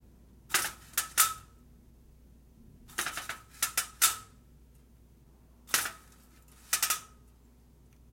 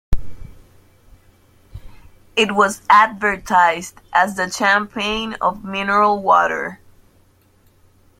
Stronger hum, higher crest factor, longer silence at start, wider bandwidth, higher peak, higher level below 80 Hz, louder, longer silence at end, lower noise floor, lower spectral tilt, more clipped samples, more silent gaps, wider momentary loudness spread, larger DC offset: neither; first, 28 dB vs 18 dB; first, 0.5 s vs 0.1 s; about the same, 16.5 kHz vs 16.5 kHz; second, -8 dBFS vs 0 dBFS; second, -60 dBFS vs -36 dBFS; second, -30 LUFS vs -17 LUFS; second, 1.05 s vs 1.45 s; first, -59 dBFS vs -55 dBFS; second, 1 dB/octave vs -3.5 dB/octave; neither; neither; first, 14 LU vs 11 LU; neither